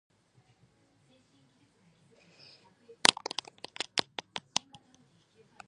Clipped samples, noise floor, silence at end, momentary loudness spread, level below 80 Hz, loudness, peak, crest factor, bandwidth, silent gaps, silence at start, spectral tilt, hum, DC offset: under 0.1%; -67 dBFS; 1.3 s; 17 LU; -78 dBFS; -31 LUFS; 0 dBFS; 38 dB; 11 kHz; none; 3.05 s; 0 dB/octave; none; under 0.1%